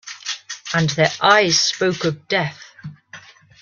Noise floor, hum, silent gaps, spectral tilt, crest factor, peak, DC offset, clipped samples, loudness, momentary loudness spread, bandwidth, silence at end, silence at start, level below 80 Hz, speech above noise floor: -43 dBFS; none; none; -3 dB/octave; 18 dB; -2 dBFS; under 0.1%; under 0.1%; -18 LUFS; 23 LU; 10 kHz; 0.45 s; 0.05 s; -58 dBFS; 26 dB